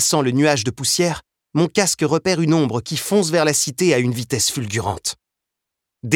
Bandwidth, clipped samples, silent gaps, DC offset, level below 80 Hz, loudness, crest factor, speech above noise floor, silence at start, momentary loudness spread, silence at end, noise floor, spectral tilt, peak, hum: 17.5 kHz; under 0.1%; none; under 0.1%; -54 dBFS; -18 LUFS; 18 dB; 64 dB; 0 s; 9 LU; 0 s; -82 dBFS; -4 dB/octave; 0 dBFS; none